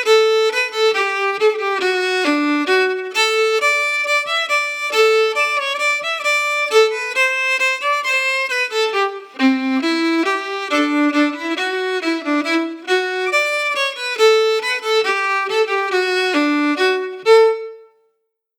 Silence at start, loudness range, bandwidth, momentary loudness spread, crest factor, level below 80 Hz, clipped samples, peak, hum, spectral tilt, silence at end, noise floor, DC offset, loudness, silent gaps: 0 s; 2 LU; 18 kHz; 6 LU; 16 dB; -88 dBFS; under 0.1%; -2 dBFS; none; -0.5 dB/octave; 0.75 s; -70 dBFS; under 0.1%; -16 LUFS; none